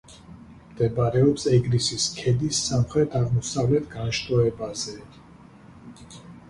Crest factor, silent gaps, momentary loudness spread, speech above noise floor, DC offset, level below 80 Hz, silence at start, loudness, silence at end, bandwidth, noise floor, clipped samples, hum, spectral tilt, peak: 18 dB; none; 12 LU; 25 dB; under 0.1%; -48 dBFS; 0.1 s; -24 LUFS; 0.1 s; 11.5 kHz; -48 dBFS; under 0.1%; none; -5.5 dB/octave; -6 dBFS